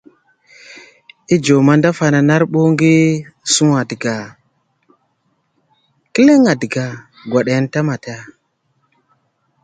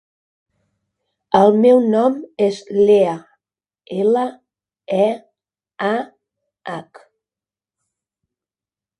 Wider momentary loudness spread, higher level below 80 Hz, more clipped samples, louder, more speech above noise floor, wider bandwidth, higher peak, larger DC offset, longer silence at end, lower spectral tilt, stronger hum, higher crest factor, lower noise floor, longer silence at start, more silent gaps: second, 15 LU vs 18 LU; first, -56 dBFS vs -66 dBFS; neither; about the same, -14 LUFS vs -16 LUFS; second, 51 dB vs over 74 dB; second, 9.4 kHz vs 10.5 kHz; about the same, 0 dBFS vs 0 dBFS; neither; second, 1.4 s vs 2.15 s; second, -5.5 dB/octave vs -7 dB/octave; neither; about the same, 16 dB vs 20 dB; second, -64 dBFS vs under -90 dBFS; second, 0.7 s vs 1.3 s; neither